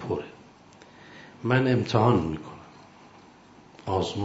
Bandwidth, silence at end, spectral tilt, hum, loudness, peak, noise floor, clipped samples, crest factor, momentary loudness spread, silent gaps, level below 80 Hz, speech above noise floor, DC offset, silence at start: 8 kHz; 0 s; -7 dB/octave; none; -25 LUFS; -6 dBFS; -52 dBFS; under 0.1%; 22 dB; 25 LU; none; -56 dBFS; 29 dB; under 0.1%; 0 s